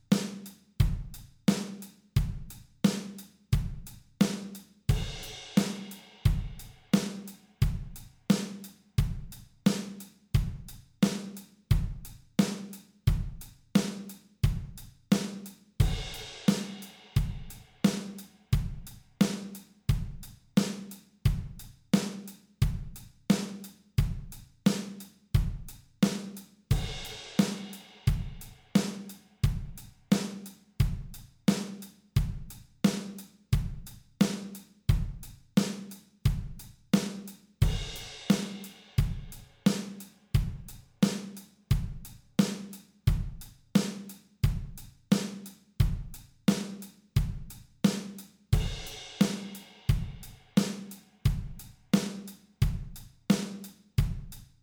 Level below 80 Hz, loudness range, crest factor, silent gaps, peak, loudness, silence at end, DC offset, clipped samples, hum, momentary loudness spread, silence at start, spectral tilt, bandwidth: -38 dBFS; 1 LU; 20 dB; none; -10 dBFS; -32 LUFS; 0.2 s; under 0.1%; under 0.1%; none; 17 LU; 0.1 s; -6 dB/octave; over 20 kHz